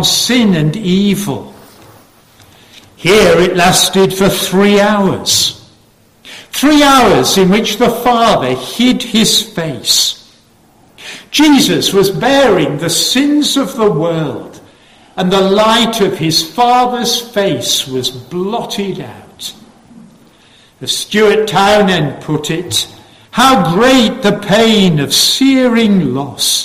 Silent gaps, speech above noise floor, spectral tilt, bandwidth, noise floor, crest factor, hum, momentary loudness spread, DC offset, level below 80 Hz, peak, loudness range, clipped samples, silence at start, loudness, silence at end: none; 37 dB; -3.5 dB/octave; 16 kHz; -48 dBFS; 12 dB; none; 11 LU; under 0.1%; -42 dBFS; 0 dBFS; 5 LU; under 0.1%; 0 s; -10 LUFS; 0 s